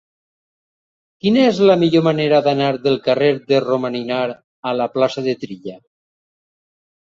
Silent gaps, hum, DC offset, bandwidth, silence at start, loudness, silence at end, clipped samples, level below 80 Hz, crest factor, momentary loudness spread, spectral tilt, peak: 4.44-4.63 s; none; under 0.1%; 7.6 kHz; 1.25 s; -17 LUFS; 1.3 s; under 0.1%; -62 dBFS; 16 dB; 13 LU; -7 dB/octave; -2 dBFS